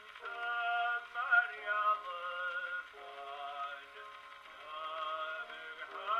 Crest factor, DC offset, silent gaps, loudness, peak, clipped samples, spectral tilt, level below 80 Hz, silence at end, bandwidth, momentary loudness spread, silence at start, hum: 20 dB; under 0.1%; none; -37 LUFS; -18 dBFS; under 0.1%; -0.5 dB/octave; -82 dBFS; 0 s; 12.5 kHz; 19 LU; 0 s; none